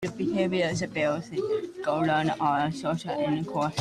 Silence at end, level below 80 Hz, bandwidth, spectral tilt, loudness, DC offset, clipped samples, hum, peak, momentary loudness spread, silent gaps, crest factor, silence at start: 0 s; -60 dBFS; 12.5 kHz; -6 dB/octave; -28 LUFS; under 0.1%; under 0.1%; none; -12 dBFS; 5 LU; none; 16 dB; 0 s